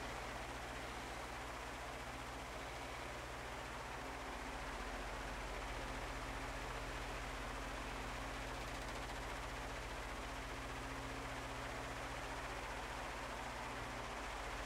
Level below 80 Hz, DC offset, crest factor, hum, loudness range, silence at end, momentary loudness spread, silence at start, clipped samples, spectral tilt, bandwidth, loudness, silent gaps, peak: -54 dBFS; under 0.1%; 14 dB; 60 Hz at -55 dBFS; 2 LU; 0 s; 2 LU; 0 s; under 0.1%; -3.5 dB/octave; 16 kHz; -47 LUFS; none; -32 dBFS